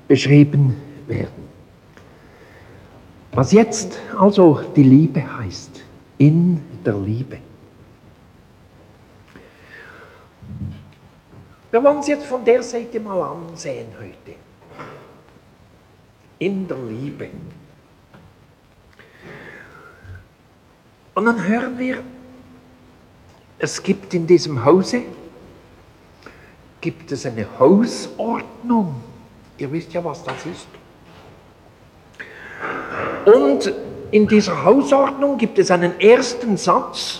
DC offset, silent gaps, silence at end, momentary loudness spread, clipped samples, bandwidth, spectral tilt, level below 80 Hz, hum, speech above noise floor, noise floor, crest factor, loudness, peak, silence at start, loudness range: under 0.1%; none; 0 s; 24 LU; under 0.1%; 11.5 kHz; -6.5 dB/octave; -54 dBFS; none; 35 dB; -52 dBFS; 20 dB; -17 LUFS; 0 dBFS; 0.1 s; 16 LU